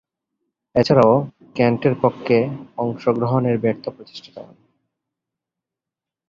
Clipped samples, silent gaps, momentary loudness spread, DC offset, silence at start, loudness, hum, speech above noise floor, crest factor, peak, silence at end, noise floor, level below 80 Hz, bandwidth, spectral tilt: under 0.1%; none; 19 LU; under 0.1%; 0.75 s; -19 LUFS; none; 68 dB; 20 dB; -2 dBFS; 1.85 s; -87 dBFS; -56 dBFS; 7.4 kHz; -8 dB/octave